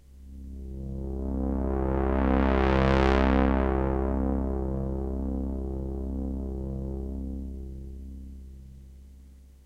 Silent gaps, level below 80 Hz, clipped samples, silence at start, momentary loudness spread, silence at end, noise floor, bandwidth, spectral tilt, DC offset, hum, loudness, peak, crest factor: none; -32 dBFS; under 0.1%; 0.1 s; 20 LU; 0.15 s; -50 dBFS; 6.4 kHz; -8.5 dB/octave; under 0.1%; none; -28 LUFS; -8 dBFS; 20 dB